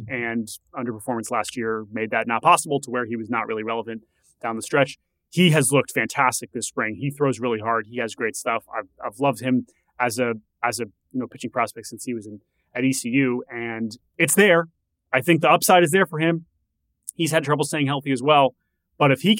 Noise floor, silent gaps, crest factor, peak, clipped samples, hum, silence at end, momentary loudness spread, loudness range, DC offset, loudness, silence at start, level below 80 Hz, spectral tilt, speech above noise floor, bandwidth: -74 dBFS; none; 18 dB; -4 dBFS; under 0.1%; none; 0 s; 14 LU; 7 LU; under 0.1%; -22 LUFS; 0 s; -68 dBFS; -4.5 dB/octave; 52 dB; 16.5 kHz